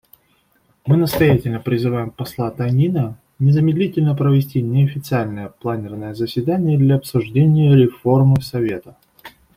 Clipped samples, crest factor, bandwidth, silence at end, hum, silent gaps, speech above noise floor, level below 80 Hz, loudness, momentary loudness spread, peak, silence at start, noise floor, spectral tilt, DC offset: under 0.1%; 14 dB; 16 kHz; 0.3 s; none; none; 44 dB; -48 dBFS; -17 LUFS; 11 LU; -2 dBFS; 0.85 s; -60 dBFS; -8.5 dB/octave; under 0.1%